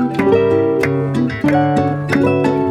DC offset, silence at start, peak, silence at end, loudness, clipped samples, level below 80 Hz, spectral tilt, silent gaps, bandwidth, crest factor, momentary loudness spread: under 0.1%; 0 s; -2 dBFS; 0 s; -15 LUFS; under 0.1%; -46 dBFS; -8 dB/octave; none; 13 kHz; 14 dB; 4 LU